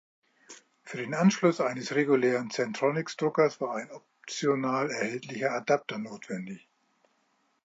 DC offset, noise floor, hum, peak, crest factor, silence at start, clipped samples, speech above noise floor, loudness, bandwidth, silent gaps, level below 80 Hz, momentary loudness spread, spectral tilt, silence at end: under 0.1%; -72 dBFS; none; -10 dBFS; 20 dB; 0.5 s; under 0.1%; 44 dB; -29 LUFS; 8 kHz; none; -82 dBFS; 14 LU; -5.5 dB/octave; 1.05 s